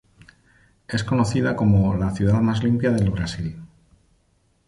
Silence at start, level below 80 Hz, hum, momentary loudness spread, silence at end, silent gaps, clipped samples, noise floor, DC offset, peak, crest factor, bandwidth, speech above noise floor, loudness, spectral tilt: 0.9 s; -40 dBFS; none; 10 LU; 1 s; none; under 0.1%; -64 dBFS; under 0.1%; -6 dBFS; 16 dB; 11.5 kHz; 44 dB; -21 LUFS; -7 dB/octave